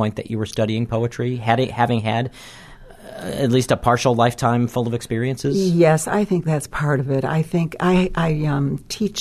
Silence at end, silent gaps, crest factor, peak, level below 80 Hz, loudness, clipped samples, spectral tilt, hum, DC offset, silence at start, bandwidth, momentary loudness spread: 0 s; none; 18 dB; -2 dBFS; -42 dBFS; -20 LUFS; under 0.1%; -6 dB/octave; none; under 0.1%; 0 s; 13.5 kHz; 8 LU